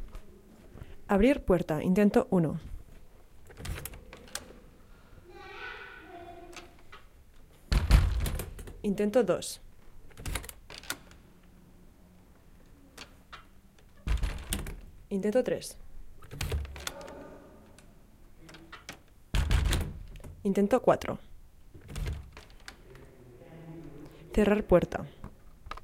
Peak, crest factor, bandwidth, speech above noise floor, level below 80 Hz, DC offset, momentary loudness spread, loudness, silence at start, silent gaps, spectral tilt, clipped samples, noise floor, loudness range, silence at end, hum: -6 dBFS; 26 dB; 16.5 kHz; 30 dB; -38 dBFS; under 0.1%; 25 LU; -30 LUFS; 0 s; none; -6 dB/octave; under 0.1%; -56 dBFS; 16 LU; 0.05 s; none